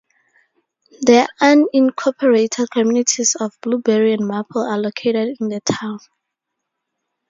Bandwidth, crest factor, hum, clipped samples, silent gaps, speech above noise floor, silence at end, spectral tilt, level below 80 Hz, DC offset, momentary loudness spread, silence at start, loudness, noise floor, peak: 7.8 kHz; 18 dB; none; under 0.1%; none; 62 dB; 1.3 s; -3.5 dB/octave; -64 dBFS; under 0.1%; 9 LU; 1 s; -17 LUFS; -78 dBFS; 0 dBFS